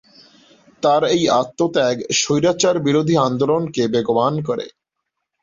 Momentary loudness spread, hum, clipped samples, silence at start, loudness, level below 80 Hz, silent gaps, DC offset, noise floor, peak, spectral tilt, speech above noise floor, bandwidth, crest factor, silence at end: 6 LU; none; under 0.1%; 0.8 s; -18 LUFS; -58 dBFS; none; under 0.1%; -78 dBFS; -2 dBFS; -4.5 dB/octave; 61 dB; 7.8 kHz; 16 dB; 0.75 s